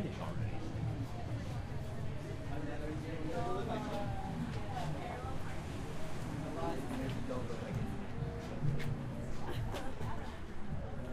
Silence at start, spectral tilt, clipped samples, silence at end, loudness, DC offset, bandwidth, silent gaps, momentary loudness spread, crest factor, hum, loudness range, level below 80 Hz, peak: 0 s; -7 dB/octave; under 0.1%; 0 s; -41 LUFS; under 0.1%; 14 kHz; none; 5 LU; 16 dB; none; 1 LU; -48 dBFS; -22 dBFS